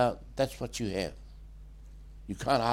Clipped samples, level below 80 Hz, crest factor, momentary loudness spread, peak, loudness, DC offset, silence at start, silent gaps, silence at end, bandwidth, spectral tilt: under 0.1%; -48 dBFS; 20 dB; 22 LU; -12 dBFS; -33 LUFS; under 0.1%; 0 s; none; 0 s; 16.5 kHz; -5 dB/octave